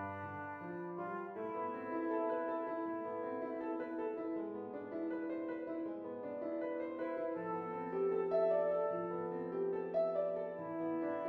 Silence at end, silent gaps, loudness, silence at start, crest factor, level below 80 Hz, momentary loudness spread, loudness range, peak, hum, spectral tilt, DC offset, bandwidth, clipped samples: 0 s; none; -40 LUFS; 0 s; 16 dB; -82 dBFS; 9 LU; 5 LU; -24 dBFS; none; -9.5 dB/octave; under 0.1%; 4.7 kHz; under 0.1%